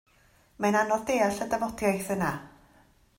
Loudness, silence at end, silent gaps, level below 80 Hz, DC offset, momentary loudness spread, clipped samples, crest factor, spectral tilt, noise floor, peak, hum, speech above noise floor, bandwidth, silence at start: -28 LUFS; 0.7 s; none; -58 dBFS; under 0.1%; 5 LU; under 0.1%; 18 dB; -5 dB/octave; -62 dBFS; -12 dBFS; none; 35 dB; 16.5 kHz; 0.6 s